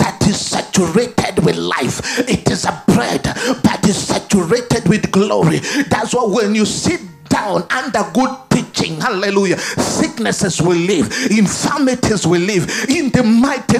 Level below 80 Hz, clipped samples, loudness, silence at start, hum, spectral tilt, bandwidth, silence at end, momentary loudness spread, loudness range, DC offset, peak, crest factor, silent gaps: -42 dBFS; under 0.1%; -15 LUFS; 0 s; none; -4.5 dB/octave; 15.5 kHz; 0 s; 4 LU; 2 LU; under 0.1%; 0 dBFS; 14 dB; none